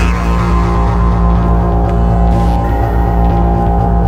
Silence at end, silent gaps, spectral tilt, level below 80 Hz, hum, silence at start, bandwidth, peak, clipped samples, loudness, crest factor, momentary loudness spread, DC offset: 0 s; none; -8.5 dB/octave; -12 dBFS; none; 0 s; 7.4 kHz; 0 dBFS; under 0.1%; -12 LUFS; 10 dB; 2 LU; under 0.1%